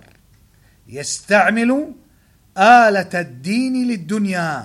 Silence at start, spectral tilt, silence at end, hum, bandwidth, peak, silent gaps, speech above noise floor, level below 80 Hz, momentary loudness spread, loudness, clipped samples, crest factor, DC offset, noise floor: 0.9 s; -4.5 dB/octave; 0 s; none; 13.5 kHz; 0 dBFS; none; 38 dB; -58 dBFS; 17 LU; -16 LUFS; under 0.1%; 18 dB; under 0.1%; -54 dBFS